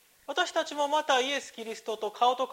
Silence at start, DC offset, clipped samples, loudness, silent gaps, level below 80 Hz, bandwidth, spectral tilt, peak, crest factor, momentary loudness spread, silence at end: 0.3 s; under 0.1%; under 0.1%; -29 LUFS; none; -80 dBFS; 16 kHz; -0.5 dB/octave; -10 dBFS; 18 dB; 10 LU; 0 s